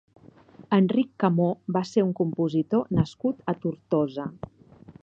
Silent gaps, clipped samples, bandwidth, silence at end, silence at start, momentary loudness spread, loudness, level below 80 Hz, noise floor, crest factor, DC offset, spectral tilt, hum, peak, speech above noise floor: none; under 0.1%; 7.6 kHz; 0.1 s; 0.6 s; 8 LU; -25 LUFS; -56 dBFS; -51 dBFS; 18 dB; under 0.1%; -8.5 dB/octave; none; -6 dBFS; 26 dB